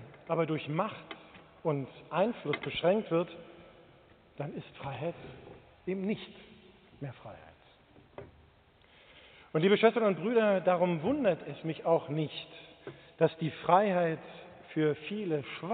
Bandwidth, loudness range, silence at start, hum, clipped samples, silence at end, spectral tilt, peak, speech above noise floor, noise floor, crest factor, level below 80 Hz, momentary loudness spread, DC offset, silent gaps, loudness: 4.6 kHz; 14 LU; 0 s; none; under 0.1%; 0 s; -5 dB/octave; -10 dBFS; 31 dB; -62 dBFS; 22 dB; -68 dBFS; 22 LU; under 0.1%; none; -31 LUFS